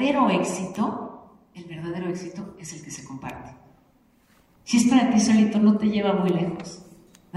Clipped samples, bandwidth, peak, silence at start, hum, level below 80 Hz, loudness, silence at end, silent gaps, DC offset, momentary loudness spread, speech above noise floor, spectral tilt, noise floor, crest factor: under 0.1%; 12 kHz; -8 dBFS; 0 s; none; -60 dBFS; -22 LUFS; 0 s; none; under 0.1%; 21 LU; 38 dB; -5.5 dB/octave; -60 dBFS; 16 dB